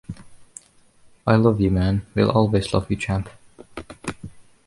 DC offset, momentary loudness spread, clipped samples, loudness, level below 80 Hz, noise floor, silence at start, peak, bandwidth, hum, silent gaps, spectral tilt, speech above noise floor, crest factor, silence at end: under 0.1%; 23 LU; under 0.1%; -21 LUFS; -40 dBFS; -53 dBFS; 0.1 s; -4 dBFS; 11.5 kHz; none; none; -7 dB/octave; 34 dB; 20 dB; 0.25 s